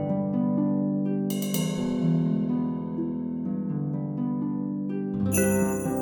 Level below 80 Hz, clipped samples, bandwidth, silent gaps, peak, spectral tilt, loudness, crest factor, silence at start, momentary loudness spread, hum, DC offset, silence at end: -56 dBFS; under 0.1%; 19.5 kHz; none; -8 dBFS; -6.5 dB/octave; -27 LUFS; 18 dB; 0 s; 6 LU; none; under 0.1%; 0 s